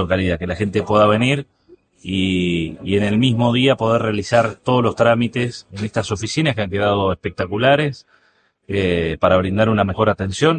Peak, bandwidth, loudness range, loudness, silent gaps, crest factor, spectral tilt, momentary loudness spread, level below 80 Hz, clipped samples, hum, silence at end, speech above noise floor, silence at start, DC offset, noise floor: 0 dBFS; 9.4 kHz; 3 LU; -18 LUFS; none; 18 dB; -6 dB/octave; 8 LU; -48 dBFS; under 0.1%; none; 0 s; 42 dB; 0 s; under 0.1%; -60 dBFS